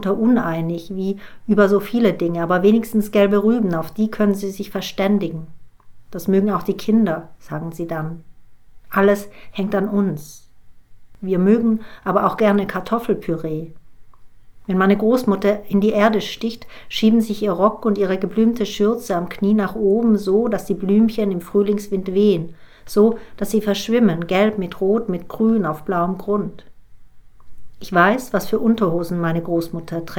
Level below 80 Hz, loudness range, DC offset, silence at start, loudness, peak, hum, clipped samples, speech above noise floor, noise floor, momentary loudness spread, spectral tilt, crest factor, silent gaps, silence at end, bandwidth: -46 dBFS; 4 LU; under 0.1%; 0 s; -19 LUFS; 0 dBFS; none; under 0.1%; 22 dB; -41 dBFS; 11 LU; -7 dB/octave; 18 dB; none; 0 s; 17.5 kHz